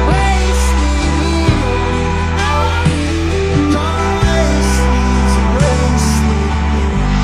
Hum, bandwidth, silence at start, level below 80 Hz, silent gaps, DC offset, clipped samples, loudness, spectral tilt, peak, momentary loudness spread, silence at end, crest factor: none; 13.5 kHz; 0 s; -16 dBFS; none; under 0.1%; under 0.1%; -14 LUFS; -5.5 dB/octave; 0 dBFS; 3 LU; 0 s; 12 dB